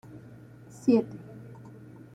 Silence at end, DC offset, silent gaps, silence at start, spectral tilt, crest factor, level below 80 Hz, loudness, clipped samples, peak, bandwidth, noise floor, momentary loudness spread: 0.75 s; under 0.1%; none; 0.15 s; -8 dB/octave; 20 dB; -68 dBFS; -26 LUFS; under 0.1%; -12 dBFS; 10 kHz; -49 dBFS; 25 LU